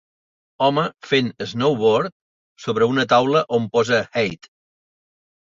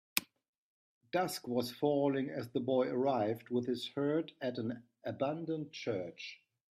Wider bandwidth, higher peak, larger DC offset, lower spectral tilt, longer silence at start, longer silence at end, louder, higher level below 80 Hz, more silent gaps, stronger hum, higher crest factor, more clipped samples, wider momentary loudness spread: second, 7.6 kHz vs 15.5 kHz; first, -4 dBFS vs -12 dBFS; neither; about the same, -5.5 dB/octave vs -5 dB/octave; first, 0.6 s vs 0.15 s; first, 1.25 s vs 0.45 s; first, -20 LUFS vs -36 LUFS; first, -60 dBFS vs -80 dBFS; second, 2.12-2.56 s vs 0.48-1.01 s; neither; second, 18 dB vs 26 dB; neither; about the same, 10 LU vs 9 LU